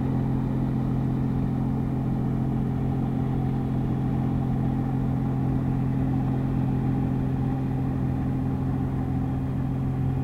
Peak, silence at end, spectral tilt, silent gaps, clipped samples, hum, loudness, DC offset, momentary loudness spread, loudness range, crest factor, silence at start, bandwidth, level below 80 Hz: -14 dBFS; 0 s; -10.5 dB/octave; none; under 0.1%; none; -26 LUFS; under 0.1%; 2 LU; 1 LU; 10 dB; 0 s; 4.2 kHz; -38 dBFS